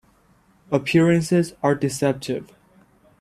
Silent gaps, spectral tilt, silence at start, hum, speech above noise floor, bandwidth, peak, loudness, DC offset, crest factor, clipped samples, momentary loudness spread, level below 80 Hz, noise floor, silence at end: none; -6 dB/octave; 0.7 s; none; 38 dB; 14.5 kHz; -4 dBFS; -21 LUFS; under 0.1%; 18 dB; under 0.1%; 10 LU; -58 dBFS; -58 dBFS; 0.75 s